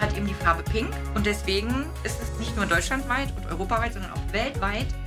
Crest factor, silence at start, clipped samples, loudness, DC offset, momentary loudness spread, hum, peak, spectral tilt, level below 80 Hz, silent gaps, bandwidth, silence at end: 18 dB; 0 s; under 0.1%; -27 LUFS; under 0.1%; 7 LU; none; -8 dBFS; -5 dB/octave; -32 dBFS; none; 16 kHz; 0 s